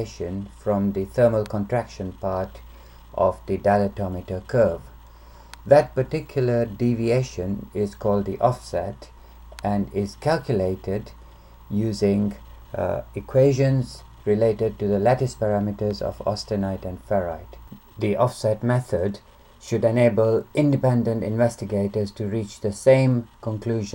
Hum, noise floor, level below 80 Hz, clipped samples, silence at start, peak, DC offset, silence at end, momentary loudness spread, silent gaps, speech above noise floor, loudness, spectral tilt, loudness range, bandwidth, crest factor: none; -46 dBFS; -46 dBFS; under 0.1%; 0 s; -2 dBFS; under 0.1%; 0 s; 13 LU; none; 23 dB; -23 LUFS; -7.5 dB/octave; 4 LU; 16.5 kHz; 20 dB